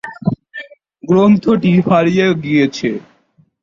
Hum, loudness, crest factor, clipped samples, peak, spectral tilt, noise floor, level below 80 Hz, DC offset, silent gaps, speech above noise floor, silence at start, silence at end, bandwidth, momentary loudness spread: none; -14 LUFS; 14 dB; under 0.1%; -2 dBFS; -7.5 dB/octave; -55 dBFS; -52 dBFS; under 0.1%; none; 43 dB; 0.05 s; 0.65 s; 7.4 kHz; 18 LU